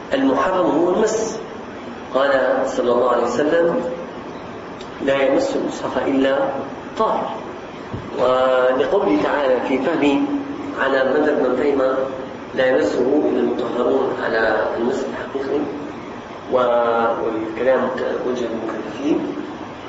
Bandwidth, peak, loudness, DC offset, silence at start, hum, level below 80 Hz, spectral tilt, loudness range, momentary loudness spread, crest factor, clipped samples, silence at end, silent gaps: 8 kHz; -4 dBFS; -19 LUFS; under 0.1%; 0 s; none; -52 dBFS; -5 dB/octave; 3 LU; 13 LU; 14 dB; under 0.1%; 0 s; none